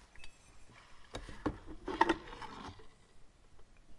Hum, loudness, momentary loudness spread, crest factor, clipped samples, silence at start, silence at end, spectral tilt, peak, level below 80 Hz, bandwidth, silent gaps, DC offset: none; -39 LUFS; 26 LU; 30 dB; under 0.1%; 0 s; 0 s; -5 dB/octave; -12 dBFS; -56 dBFS; 11.5 kHz; none; under 0.1%